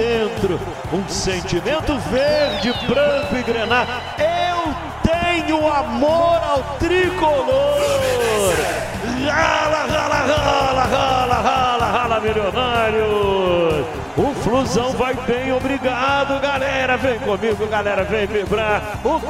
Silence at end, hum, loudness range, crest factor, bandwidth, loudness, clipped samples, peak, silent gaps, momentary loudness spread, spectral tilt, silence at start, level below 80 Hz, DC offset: 0 s; none; 2 LU; 16 dB; 16 kHz; -18 LUFS; under 0.1%; -2 dBFS; none; 5 LU; -4.5 dB/octave; 0 s; -36 dBFS; 0.1%